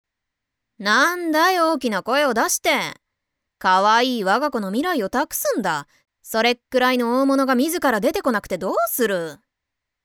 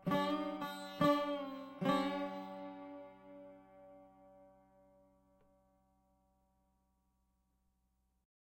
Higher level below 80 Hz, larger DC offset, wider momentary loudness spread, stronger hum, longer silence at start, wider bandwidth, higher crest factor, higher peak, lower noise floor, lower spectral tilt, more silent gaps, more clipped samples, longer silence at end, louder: first, -60 dBFS vs -74 dBFS; neither; second, 7 LU vs 25 LU; neither; first, 0.8 s vs 0 s; first, 20 kHz vs 16 kHz; second, 14 dB vs 24 dB; first, -6 dBFS vs -18 dBFS; about the same, -82 dBFS vs -80 dBFS; second, -3 dB/octave vs -6 dB/octave; neither; neither; second, 0.7 s vs 4.1 s; first, -20 LUFS vs -38 LUFS